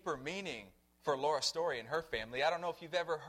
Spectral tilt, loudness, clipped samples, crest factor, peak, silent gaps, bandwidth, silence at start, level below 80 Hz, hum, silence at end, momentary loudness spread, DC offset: -3 dB/octave; -37 LUFS; under 0.1%; 18 dB; -20 dBFS; none; 16.5 kHz; 0.05 s; -68 dBFS; none; 0 s; 9 LU; under 0.1%